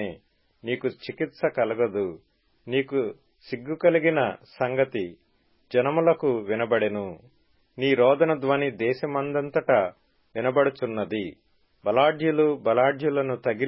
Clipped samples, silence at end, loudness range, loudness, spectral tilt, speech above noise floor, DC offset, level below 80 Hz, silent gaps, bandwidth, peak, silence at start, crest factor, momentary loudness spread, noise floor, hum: under 0.1%; 0 s; 3 LU; -25 LUFS; -10.5 dB/octave; 35 dB; under 0.1%; -66 dBFS; none; 5.8 kHz; -8 dBFS; 0 s; 18 dB; 12 LU; -59 dBFS; none